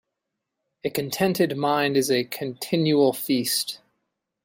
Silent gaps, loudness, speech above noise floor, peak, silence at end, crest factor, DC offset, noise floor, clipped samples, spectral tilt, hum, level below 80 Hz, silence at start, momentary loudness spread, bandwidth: none; -23 LUFS; 59 dB; -8 dBFS; 0.7 s; 16 dB; under 0.1%; -82 dBFS; under 0.1%; -4.5 dB/octave; none; -66 dBFS; 0.85 s; 10 LU; 16.5 kHz